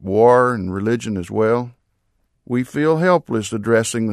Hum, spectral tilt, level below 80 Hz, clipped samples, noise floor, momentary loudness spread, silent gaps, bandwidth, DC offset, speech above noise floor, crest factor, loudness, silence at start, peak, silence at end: none; -6 dB/octave; -56 dBFS; under 0.1%; -66 dBFS; 10 LU; none; 13.5 kHz; under 0.1%; 49 dB; 16 dB; -18 LUFS; 0 s; -2 dBFS; 0 s